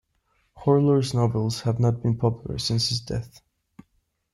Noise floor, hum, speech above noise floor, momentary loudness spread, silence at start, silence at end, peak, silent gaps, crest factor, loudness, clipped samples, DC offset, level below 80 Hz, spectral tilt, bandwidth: -70 dBFS; none; 47 dB; 9 LU; 0.55 s; 1.05 s; -8 dBFS; none; 16 dB; -24 LUFS; under 0.1%; under 0.1%; -50 dBFS; -6.5 dB/octave; 12.5 kHz